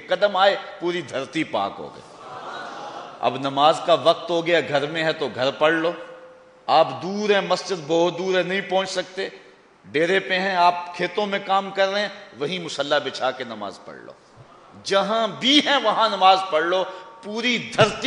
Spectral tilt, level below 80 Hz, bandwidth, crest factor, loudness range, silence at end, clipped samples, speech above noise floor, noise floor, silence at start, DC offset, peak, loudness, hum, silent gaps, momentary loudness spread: -4 dB/octave; -66 dBFS; 10 kHz; 20 dB; 5 LU; 0 s; under 0.1%; 25 dB; -47 dBFS; 0 s; under 0.1%; -4 dBFS; -21 LUFS; none; none; 17 LU